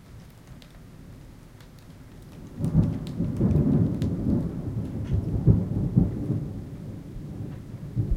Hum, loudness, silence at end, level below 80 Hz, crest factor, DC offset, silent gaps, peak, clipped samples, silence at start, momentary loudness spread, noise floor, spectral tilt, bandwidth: none; -26 LUFS; 0 s; -38 dBFS; 22 dB; under 0.1%; none; -4 dBFS; under 0.1%; 0 s; 25 LU; -47 dBFS; -10 dB/octave; 12 kHz